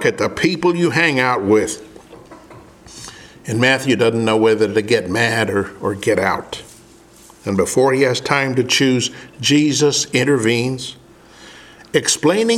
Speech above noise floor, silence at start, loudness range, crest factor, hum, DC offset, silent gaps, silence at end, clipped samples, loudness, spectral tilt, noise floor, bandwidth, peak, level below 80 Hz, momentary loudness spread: 29 dB; 0 s; 3 LU; 18 dB; none; under 0.1%; none; 0 s; under 0.1%; -16 LUFS; -4 dB/octave; -45 dBFS; 15.5 kHz; 0 dBFS; -54 dBFS; 13 LU